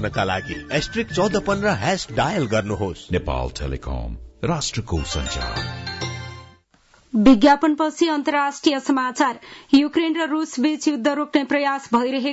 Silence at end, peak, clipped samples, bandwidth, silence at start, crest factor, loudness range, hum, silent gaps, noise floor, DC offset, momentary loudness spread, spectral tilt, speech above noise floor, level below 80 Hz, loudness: 0 s; -4 dBFS; under 0.1%; 8 kHz; 0 s; 16 dB; 8 LU; none; none; -56 dBFS; under 0.1%; 11 LU; -5 dB/octave; 36 dB; -38 dBFS; -21 LUFS